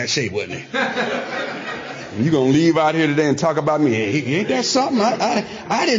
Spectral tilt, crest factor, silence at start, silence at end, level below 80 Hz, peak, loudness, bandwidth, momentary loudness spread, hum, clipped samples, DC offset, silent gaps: -5 dB/octave; 12 dB; 0 s; 0 s; -58 dBFS; -6 dBFS; -19 LUFS; 7.6 kHz; 10 LU; none; under 0.1%; under 0.1%; none